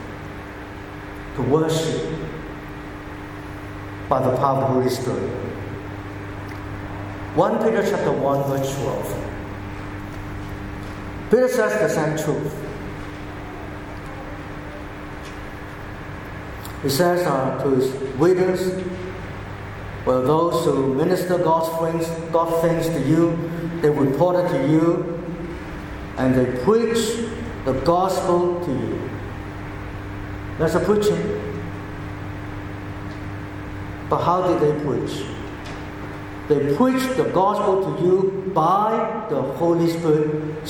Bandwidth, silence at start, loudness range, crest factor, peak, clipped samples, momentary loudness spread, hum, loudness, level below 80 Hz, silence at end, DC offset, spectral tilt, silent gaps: 17.5 kHz; 0 s; 6 LU; 20 dB; -2 dBFS; under 0.1%; 15 LU; none; -22 LUFS; -42 dBFS; 0 s; under 0.1%; -6.5 dB/octave; none